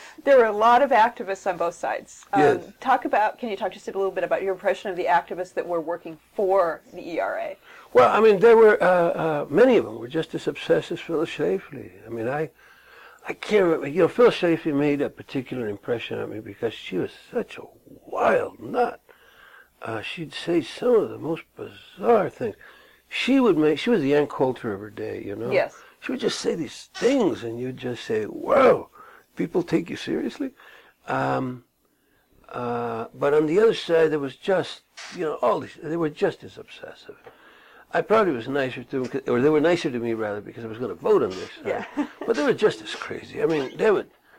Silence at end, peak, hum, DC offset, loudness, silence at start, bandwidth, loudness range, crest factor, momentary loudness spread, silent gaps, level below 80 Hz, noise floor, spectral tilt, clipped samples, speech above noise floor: 0.35 s; -6 dBFS; none; under 0.1%; -23 LUFS; 0 s; 15.5 kHz; 9 LU; 18 dB; 15 LU; none; -62 dBFS; -66 dBFS; -6 dB/octave; under 0.1%; 43 dB